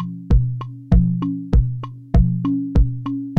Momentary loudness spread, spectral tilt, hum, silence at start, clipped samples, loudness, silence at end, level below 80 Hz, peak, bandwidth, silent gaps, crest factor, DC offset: 8 LU; -10.5 dB/octave; none; 0 s; under 0.1%; -20 LUFS; 0 s; -20 dBFS; -2 dBFS; 4.5 kHz; none; 14 dB; under 0.1%